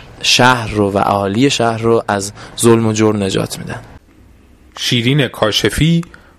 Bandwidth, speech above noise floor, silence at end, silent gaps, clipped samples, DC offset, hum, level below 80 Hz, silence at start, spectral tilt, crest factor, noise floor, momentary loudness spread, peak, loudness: 15.5 kHz; 31 dB; 0.35 s; none; under 0.1%; under 0.1%; none; -38 dBFS; 0 s; -4.5 dB/octave; 14 dB; -45 dBFS; 9 LU; 0 dBFS; -14 LUFS